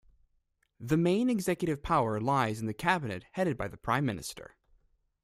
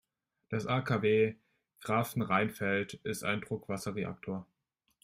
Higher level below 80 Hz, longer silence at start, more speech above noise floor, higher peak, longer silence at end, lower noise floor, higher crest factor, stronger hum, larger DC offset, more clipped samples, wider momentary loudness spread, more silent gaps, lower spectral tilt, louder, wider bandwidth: first, -56 dBFS vs -68 dBFS; first, 0.8 s vs 0.5 s; about the same, 45 dB vs 46 dB; about the same, -12 dBFS vs -14 dBFS; first, 0.8 s vs 0.6 s; second, -75 dBFS vs -79 dBFS; about the same, 20 dB vs 20 dB; neither; neither; neither; about the same, 11 LU vs 11 LU; neither; about the same, -6 dB/octave vs -6 dB/octave; first, -30 LUFS vs -33 LUFS; about the same, 15.5 kHz vs 16 kHz